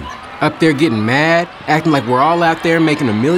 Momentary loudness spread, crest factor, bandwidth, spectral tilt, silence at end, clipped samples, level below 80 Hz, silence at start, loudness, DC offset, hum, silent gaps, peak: 5 LU; 12 dB; 15 kHz; -6 dB/octave; 0 s; under 0.1%; -48 dBFS; 0 s; -14 LUFS; under 0.1%; none; none; -2 dBFS